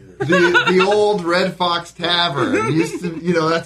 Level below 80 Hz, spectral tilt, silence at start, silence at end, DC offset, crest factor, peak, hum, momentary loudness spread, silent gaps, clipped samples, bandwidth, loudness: -54 dBFS; -5 dB/octave; 0.2 s; 0 s; under 0.1%; 14 dB; -2 dBFS; none; 7 LU; none; under 0.1%; 12.5 kHz; -16 LUFS